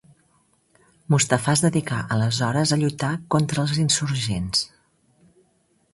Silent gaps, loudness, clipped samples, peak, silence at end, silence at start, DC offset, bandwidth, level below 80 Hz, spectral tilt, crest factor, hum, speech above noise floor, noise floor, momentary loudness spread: none; -22 LUFS; under 0.1%; -2 dBFS; 1.25 s; 1.1 s; under 0.1%; 11.5 kHz; -52 dBFS; -4.5 dB/octave; 22 dB; none; 43 dB; -65 dBFS; 6 LU